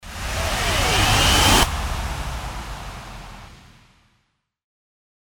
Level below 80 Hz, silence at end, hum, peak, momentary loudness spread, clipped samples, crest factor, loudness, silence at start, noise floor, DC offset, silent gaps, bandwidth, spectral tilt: -30 dBFS; 1.8 s; none; -2 dBFS; 22 LU; under 0.1%; 20 dB; -19 LUFS; 0.05 s; -69 dBFS; under 0.1%; none; over 20 kHz; -2.5 dB/octave